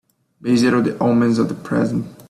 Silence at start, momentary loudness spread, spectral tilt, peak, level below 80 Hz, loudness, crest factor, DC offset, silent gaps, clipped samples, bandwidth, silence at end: 0.45 s; 6 LU; -6.5 dB/octave; -4 dBFS; -56 dBFS; -18 LUFS; 14 dB; under 0.1%; none; under 0.1%; 12.5 kHz; 0.1 s